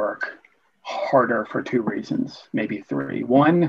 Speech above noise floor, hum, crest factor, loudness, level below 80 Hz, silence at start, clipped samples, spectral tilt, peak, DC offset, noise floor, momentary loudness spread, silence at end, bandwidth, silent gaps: 35 dB; none; 18 dB; -23 LUFS; -68 dBFS; 0 s; under 0.1%; -8 dB/octave; -4 dBFS; under 0.1%; -56 dBFS; 12 LU; 0 s; 7.2 kHz; none